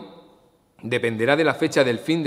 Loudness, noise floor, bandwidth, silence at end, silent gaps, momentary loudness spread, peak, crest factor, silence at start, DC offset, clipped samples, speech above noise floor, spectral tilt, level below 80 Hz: -21 LUFS; -57 dBFS; 15.5 kHz; 0 s; none; 7 LU; -2 dBFS; 20 dB; 0 s; under 0.1%; under 0.1%; 36 dB; -5.5 dB/octave; -66 dBFS